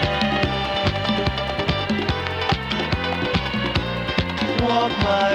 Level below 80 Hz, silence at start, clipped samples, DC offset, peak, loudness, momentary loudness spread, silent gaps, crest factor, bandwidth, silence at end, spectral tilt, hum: -36 dBFS; 0 s; under 0.1%; under 0.1%; -4 dBFS; -22 LUFS; 3 LU; none; 18 dB; 14.5 kHz; 0 s; -6 dB/octave; none